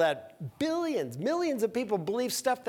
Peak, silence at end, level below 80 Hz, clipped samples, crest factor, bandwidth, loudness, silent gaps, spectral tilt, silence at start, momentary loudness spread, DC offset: -14 dBFS; 0 s; -72 dBFS; under 0.1%; 16 dB; 19 kHz; -31 LUFS; none; -4.5 dB/octave; 0 s; 4 LU; under 0.1%